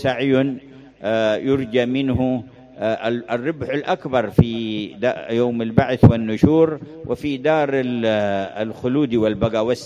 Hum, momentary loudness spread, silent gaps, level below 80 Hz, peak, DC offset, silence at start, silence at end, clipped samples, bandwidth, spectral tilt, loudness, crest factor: none; 10 LU; none; -40 dBFS; 0 dBFS; under 0.1%; 0 s; 0 s; under 0.1%; 11 kHz; -8 dB/octave; -20 LUFS; 20 dB